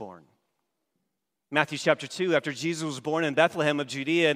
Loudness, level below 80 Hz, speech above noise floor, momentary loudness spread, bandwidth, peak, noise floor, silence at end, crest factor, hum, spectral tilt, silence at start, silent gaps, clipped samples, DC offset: -26 LUFS; -78 dBFS; 56 dB; 7 LU; 15.5 kHz; -4 dBFS; -82 dBFS; 0 s; 22 dB; none; -4.5 dB/octave; 0 s; none; under 0.1%; under 0.1%